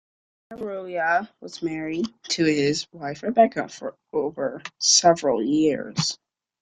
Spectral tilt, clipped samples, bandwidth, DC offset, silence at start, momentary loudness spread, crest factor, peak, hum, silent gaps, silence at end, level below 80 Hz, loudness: -3 dB/octave; under 0.1%; 11 kHz; under 0.1%; 0.5 s; 16 LU; 20 dB; -4 dBFS; none; none; 0.45 s; -64 dBFS; -23 LUFS